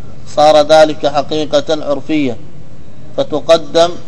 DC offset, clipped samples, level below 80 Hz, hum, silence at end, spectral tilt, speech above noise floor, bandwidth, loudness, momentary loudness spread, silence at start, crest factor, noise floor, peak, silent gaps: 10%; 1%; -44 dBFS; none; 0.05 s; -4.5 dB/octave; 25 dB; 11 kHz; -12 LUFS; 12 LU; 0 s; 14 dB; -36 dBFS; 0 dBFS; none